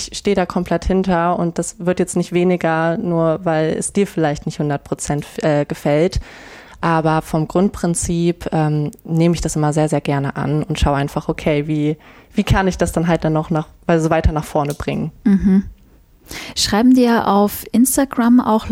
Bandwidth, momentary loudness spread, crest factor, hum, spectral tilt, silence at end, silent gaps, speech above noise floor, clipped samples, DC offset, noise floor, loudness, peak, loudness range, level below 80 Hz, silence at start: 16.5 kHz; 8 LU; 14 dB; none; -6 dB/octave; 0 s; none; 32 dB; under 0.1%; under 0.1%; -48 dBFS; -17 LUFS; -4 dBFS; 3 LU; -32 dBFS; 0 s